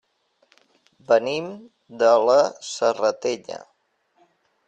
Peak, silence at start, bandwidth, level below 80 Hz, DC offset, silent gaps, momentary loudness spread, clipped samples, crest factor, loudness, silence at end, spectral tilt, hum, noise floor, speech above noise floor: -4 dBFS; 1.1 s; 9 kHz; -72 dBFS; under 0.1%; none; 20 LU; under 0.1%; 18 dB; -21 LUFS; 1.1 s; -3.5 dB/octave; none; -67 dBFS; 46 dB